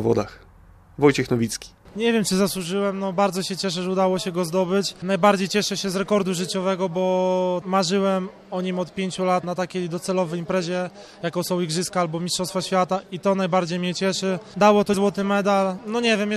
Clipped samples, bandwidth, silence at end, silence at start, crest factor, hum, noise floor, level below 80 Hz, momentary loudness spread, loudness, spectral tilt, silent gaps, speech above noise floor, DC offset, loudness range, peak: under 0.1%; 14.5 kHz; 0 s; 0 s; 18 dB; none; -49 dBFS; -56 dBFS; 8 LU; -23 LUFS; -5 dB/octave; none; 27 dB; under 0.1%; 4 LU; -4 dBFS